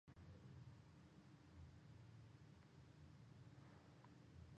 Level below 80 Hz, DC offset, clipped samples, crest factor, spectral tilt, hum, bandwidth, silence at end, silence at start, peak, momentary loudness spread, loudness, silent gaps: -74 dBFS; under 0.1%; under 0.1%; 14 dB; -6.5 dB/octave; none; 8.4 kHz; 0 s; 0.05 s; -50 dBFS; 4 LU; -65 LUFS; none